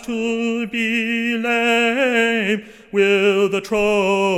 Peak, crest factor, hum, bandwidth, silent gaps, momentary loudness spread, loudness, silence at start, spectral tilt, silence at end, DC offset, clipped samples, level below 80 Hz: -4 dBFS; 14 dB; none; 15.5 kHz; none; 6 LU; -18 LUFS; 0 s; -4.5 dB/octave; 0 s; under 0.1%; under 0.1%; -52 dBFS